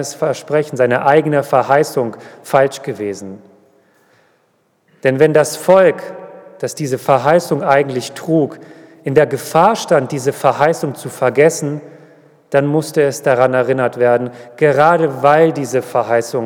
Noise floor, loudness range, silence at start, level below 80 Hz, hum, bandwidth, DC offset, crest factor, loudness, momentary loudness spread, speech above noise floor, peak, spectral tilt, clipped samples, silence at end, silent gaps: -60 dBFS; 4 LU; 0 s; -64 dBFS; none; 19.5 kHz; under 0.1%; 14 dB; -14 LUFS; 12 LU; 46 dB; 0 dBFS; -5.5 dB/octave; under 0.1%; 0 s; none